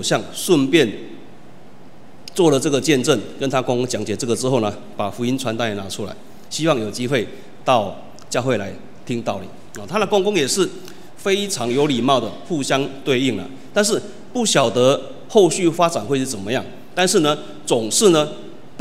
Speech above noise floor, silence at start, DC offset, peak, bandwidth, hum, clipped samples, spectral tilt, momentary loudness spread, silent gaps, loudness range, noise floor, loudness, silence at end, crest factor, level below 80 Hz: 26 dB; 0 s; 2%; 0 dBFS; 16 kHz; none; under 0.1%; -4 dB/octave; 14 LU; none; 4 LU; -45 dBFS; -19 LUFS; 0.2 s; 20 dB; -60 dBFS